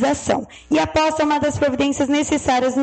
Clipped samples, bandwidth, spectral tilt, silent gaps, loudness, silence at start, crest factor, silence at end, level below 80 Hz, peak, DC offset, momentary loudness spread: under 0.1%; 9 kHz; -4.5 dB/octave; none; -19 LUFS; 0 s; 12 dB; 0 s; -44 dBFS; -6 dBFS; under 0.1%; 4 LU